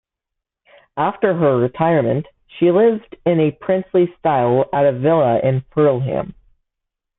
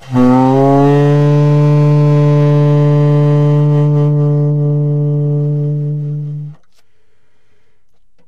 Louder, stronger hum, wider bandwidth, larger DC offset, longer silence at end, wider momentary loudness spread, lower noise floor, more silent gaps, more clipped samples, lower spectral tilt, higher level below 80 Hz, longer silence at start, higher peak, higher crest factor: second, -17 LUFS vs -11 LUFS; neither; second, 4 kHz vs 6 kHz; second, under 0.1% vs 2%; second, 0.9 s vs 1.75 s; about the same, 7 LU vs 9 LU; first, -82 dBFS vs -61 dBFS; neither; neither; first, -13 dB/octave vs -10 dB/octave; second, -54 dBFS vs -46 dBFS; first, 0.95 s vs 0.05 s; about the same, -2 dBFS vs -2 dBFS; first, 16 dB vs 10 dB